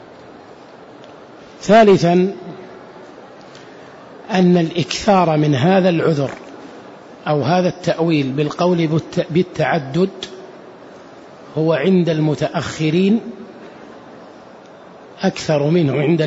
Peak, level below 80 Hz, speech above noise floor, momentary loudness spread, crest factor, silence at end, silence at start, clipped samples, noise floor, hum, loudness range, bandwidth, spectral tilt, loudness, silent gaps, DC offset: -2 dBFS; -54 dBFS; 25 dB; 24 LU; 16 dB; 0 s; 0.25 s; under 0.1%; -40 dBFS; none; 4 LU; 8 kHz; -6.5 dB/octave; -16 LUFS; none; under 0.1%